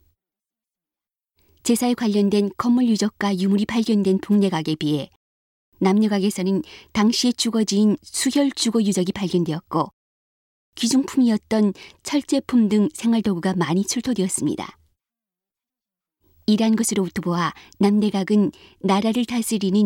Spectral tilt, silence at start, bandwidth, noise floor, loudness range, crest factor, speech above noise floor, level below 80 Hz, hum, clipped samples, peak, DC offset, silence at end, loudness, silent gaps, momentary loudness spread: -5 dB/octave; 1.65 s; 16.5 kHz; under -90 dBFS; 4 LU; 16 dB; over 70 dB; -58 dBFS; none; under 0.1%; -6 dBFS; under 0.1%; 0 s; -21 LUFS; 5.16-5.72 s, 9.93-10.72 s; 7 LU